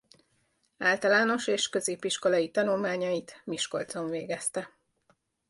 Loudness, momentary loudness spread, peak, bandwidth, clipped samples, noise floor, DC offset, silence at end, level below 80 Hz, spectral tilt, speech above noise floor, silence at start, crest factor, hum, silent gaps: -29 LUFS; 10 LU; -12 dBFS; 11.5 kHz; under 0.1%; -72 dBFS; under 0.1%; 0.85 s; -74 dBFS; -3 dB/octave; 44 dB; 0.8 s; 18 dB; none; none